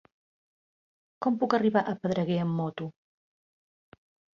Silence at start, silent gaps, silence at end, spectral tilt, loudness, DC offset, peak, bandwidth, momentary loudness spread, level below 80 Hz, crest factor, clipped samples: 1.2 s; none; 1.45 s; -8 dB/octave; -28 LUFS; under 0.1%; -10 dBFS; 7.2 kHz; 11 LU; -72 dBFS; 20 dB; under 0.1%